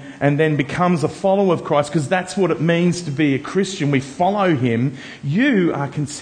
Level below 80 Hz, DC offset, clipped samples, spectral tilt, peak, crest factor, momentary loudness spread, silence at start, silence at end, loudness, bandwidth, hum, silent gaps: -56 dBFS; under 0.1%; under 0.1%; -6.5 dB/octave; -2 dBFS; 16 dB; 5 LU; 0 s; 0 s; -19 LUFS; 9.8 kHz; none; none